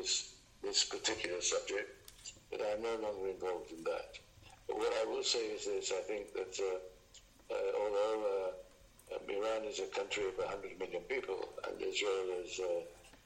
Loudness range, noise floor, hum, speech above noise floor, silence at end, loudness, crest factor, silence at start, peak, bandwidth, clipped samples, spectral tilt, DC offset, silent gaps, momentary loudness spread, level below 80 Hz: 3 LU; -62 dBFS; none; 23 dB; 0.1 s; -38 LUFS; 20 dB; 0 s; -18 dBFS; 16 kHz; under 0.1%; -1 dB/octave; under 0.1%; none; 12 LU; -68 dBFS